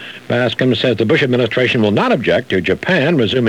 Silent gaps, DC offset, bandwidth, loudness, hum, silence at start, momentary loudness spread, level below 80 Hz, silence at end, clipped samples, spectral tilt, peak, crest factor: none; 0.2%; 12 kHz; -14 LUFS; none; 0 s; 3 LU; -50 dBFS; 0 s; under 0.1%; -6.5 dB/octave; -2 dBFS; 14 dB